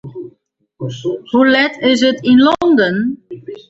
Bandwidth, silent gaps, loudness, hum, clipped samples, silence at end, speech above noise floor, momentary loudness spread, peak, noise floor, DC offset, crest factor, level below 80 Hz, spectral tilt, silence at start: 7.8 kHz; none; -13 LUFS; none; under 0.1%; 0.15 s; 45 dB; 19 LU; 0 dBFS; -58 dBFS; under 0.1%; 14 dB; -54 dBFS; -5.5 dB/octave; 0.05 s